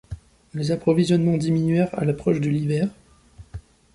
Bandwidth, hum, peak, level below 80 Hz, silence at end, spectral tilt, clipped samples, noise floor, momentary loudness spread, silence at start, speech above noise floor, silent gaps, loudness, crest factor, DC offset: 11.5 kHz; none; -6 dBFS; -48 dBFS; 0.35 s; -7.5 dB/octave; under 0.1%; -48 dBFS; 22 LU; 0.1 s; 27 dB; none; -22 LUFS; 16 dB; under 0.1%